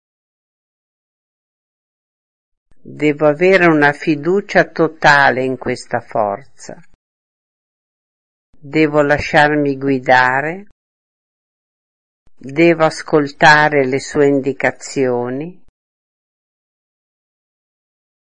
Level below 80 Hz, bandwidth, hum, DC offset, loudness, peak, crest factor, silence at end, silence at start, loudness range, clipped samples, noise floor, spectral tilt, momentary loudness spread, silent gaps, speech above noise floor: -52 dBFS; 10.5 kHz; none; 1%; -14 LUFS; 0 dBFS; 18 dB; 2.85 s; 2.85 s; 10 LU; under 0.1%; under -90 dBFS; -5.5 dB/octave; 11 LU; 6.95-8.53 s, 10.72-12.26 s; over 76 dB